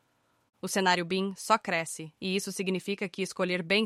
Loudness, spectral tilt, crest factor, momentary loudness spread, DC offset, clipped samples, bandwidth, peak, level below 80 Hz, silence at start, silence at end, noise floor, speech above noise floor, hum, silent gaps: -30 LUFS; -3.5 dB/octave; 20 dB; 8 LU; under 0.1%; under 0.1%; 15.5 kHz; -10 dBFS; -74 dBFS; 0.65 s; 0 s; -71 dBFS; 42 dB; none; none